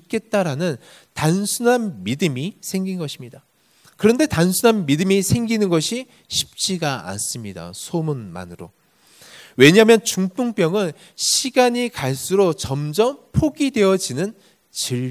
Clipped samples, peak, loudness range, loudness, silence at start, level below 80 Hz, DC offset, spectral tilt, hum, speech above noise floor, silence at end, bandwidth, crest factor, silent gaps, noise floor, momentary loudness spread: under 0.1%; 0 dBFS; 6 LU; -19 LUFS; 0.1 s; -48 dBFS; under 0.1%; -4.5 dB/octave; none; 36 dB; 0 s; 16 kHz; 20 dB; none; -55 dBFS; 13 LU